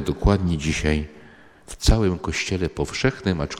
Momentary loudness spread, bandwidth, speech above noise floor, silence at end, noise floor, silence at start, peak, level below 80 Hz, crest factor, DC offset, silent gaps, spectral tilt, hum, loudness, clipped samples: 6 LU; 15.5 kHz; 26 dB; 0 s; -48 dBFS; 0 s; -2 dBFS; -28 dBFS; 20 dB; under 0.1%; none; -5.5 dB/octave; none; -23 LUFS; under 0.1%